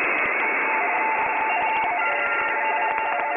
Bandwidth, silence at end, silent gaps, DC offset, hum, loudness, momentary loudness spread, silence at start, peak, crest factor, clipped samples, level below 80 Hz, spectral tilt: 3.7 kHz; 0 s; none; under 0.1%; none; -21 LUFS; 2 LU; 0 s; -6 dBFS; 18 dB; under 0.1%; -64 dBFS; -5.5 dB/octave